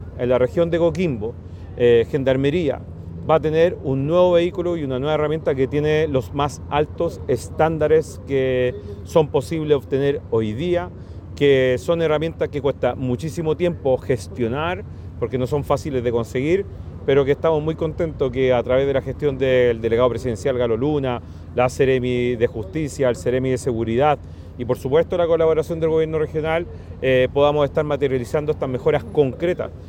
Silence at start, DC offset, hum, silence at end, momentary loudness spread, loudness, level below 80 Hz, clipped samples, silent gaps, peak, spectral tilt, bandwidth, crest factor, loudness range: 0 s; under 0.1%; none; 0 s; 8 LU; -20 LUFS; -42 dBFS; under 0.1%; none; -4 dBFS; -7 dB/octave; 16 kHz; 16 dB; 2 LU